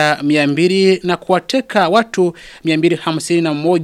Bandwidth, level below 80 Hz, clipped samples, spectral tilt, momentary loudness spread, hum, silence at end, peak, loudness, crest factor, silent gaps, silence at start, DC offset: 13 kHz; -56 dBFS; under 0.1%; -5.5 dB/octave; 5 LU; none; 0 s; 0 dBFS; -15 LUFS; 14 dB; none; 0 s; under 0.1%